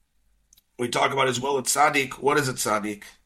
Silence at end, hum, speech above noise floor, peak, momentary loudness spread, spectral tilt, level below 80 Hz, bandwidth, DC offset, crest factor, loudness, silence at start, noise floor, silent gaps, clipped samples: 0.15 s; none; 42 dB; -8 dBFS; 8 LU; -3 dB/octave; -60 dBFS; 16.5 kHz; under 0.1%; 18 dB; -23 LUFS; 0.8 s; -66 dBFS; none; under 0.1%